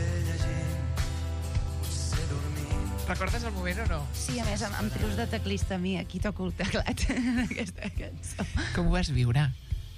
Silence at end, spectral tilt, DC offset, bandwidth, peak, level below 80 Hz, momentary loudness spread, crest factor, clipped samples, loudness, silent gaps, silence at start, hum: 0 s; -5.5 dB/octave; under 0.1%; 15.5 kHz; -14 dBFS; -36 dBFS; 6 LU; 16 dB; under 0.1%; -31 LUFS; none; 0 s; none